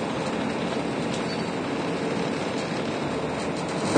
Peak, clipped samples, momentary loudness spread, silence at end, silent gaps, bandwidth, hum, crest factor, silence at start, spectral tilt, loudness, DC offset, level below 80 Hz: -6 dBFS; under 0.1%; 1 LU; 0 s; none; 10 kHz; none; 20 dB; 0 s; -5 dB/octave; -28 LUFS; under 0.1%; -54 dBFS